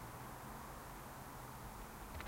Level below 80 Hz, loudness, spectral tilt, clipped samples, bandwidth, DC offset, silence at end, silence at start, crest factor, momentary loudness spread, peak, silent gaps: -58 dBFS; -51 LUFS; -4.5 dB/octave; under 0.1%; 16 kHz; under 0.1%; 0 s; 0 s; 18 dB; 1 LU; -34 dBFS; none